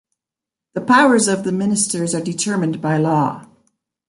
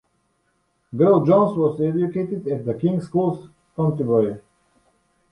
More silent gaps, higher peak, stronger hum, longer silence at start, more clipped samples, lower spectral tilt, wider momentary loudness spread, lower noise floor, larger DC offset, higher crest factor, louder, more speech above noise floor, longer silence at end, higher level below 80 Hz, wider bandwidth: neither; about the same, -2 dBFS vs -4 dBFS; neither; second, 0.75 s vs 0.95 s; neither; second, -4.5 dB/octave vs -10.5 dB/octave; about the same, 11 LU vs 12 LU; first, -87 dBFS vs -68 dBFS; neither; about the same, 18 dB vs 18 dB; first, -17 LUFS vs -20 LUFS; first, 70 dB vs 48 dB; second, 0.65 s vs 0.9 s; about the same, -62 dBFS vs -60 dBFS; about the same, 11.5 kHz vs 10.5 kHz